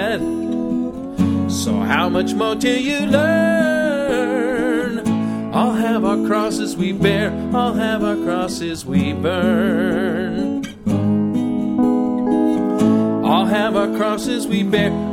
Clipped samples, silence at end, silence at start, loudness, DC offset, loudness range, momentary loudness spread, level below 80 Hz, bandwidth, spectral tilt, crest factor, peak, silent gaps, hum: under 0.1%; 0 s; 0 s; -18 LUFS; under 0.1%; 2 LU; 5 LU; -46 dBFS; 15.5 kHz; -6 dB/octave; 18 dB; 0 dBFS; none; none